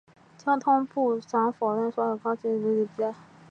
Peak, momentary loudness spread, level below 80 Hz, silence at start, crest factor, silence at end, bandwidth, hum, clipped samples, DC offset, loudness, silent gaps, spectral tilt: -12 dBFS; 8 LU; -78 dBFS; 0.45 s; 16 dB; 0.3 s; 7.2 kHz; none; under 0.1%; under 0.1%; -27 LUFS; none; -7.5 dB/octave